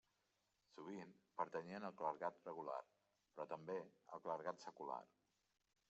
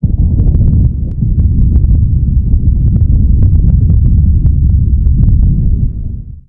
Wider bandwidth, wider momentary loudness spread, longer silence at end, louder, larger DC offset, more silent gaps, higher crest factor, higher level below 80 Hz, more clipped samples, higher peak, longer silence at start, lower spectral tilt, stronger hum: first, 8 kHz vs 1 kHz; first, 10 LU vs 5 LU; first, 0.85 s vs 0.1 s; second, -51 LUFS vs -11 LUFS; neither; neither; first, 24 dB vs 8 dB; second, under -90 dBFS vs -10 dBFS; second, under 0.1% vs 1%; second, -28 dBFS vs 0 dBFS; first, 0.75 s vs 0 s; second, -4.5 dB/octave vs -15 dB/octave; neither